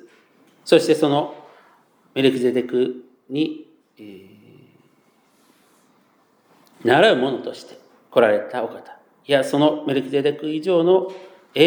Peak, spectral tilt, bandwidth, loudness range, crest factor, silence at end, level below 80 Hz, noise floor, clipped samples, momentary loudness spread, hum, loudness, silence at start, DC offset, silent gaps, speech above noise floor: -2 dBFS; -5.5 dB/octave; over 20 kHz; 9 LU; 20 dB; 0 s; -80 dBFS; -60 dBFS; under 0.1%; 22 LU; none; -20 LUFS; 0.65 s; under 0.1%; none; 41 dB